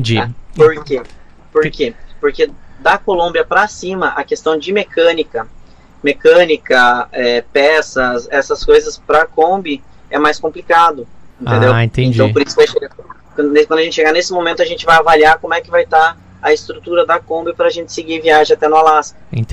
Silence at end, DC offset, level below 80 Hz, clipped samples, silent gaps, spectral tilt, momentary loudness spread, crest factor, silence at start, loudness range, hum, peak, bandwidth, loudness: 0 s; under 0.1%; -38 dBFS; under 0.1%; none; -5 dB/octave; 11 LU; 12 dB; 0 s; 4 LU; none; 0 dBFS; 10 kHz; -13 LUFS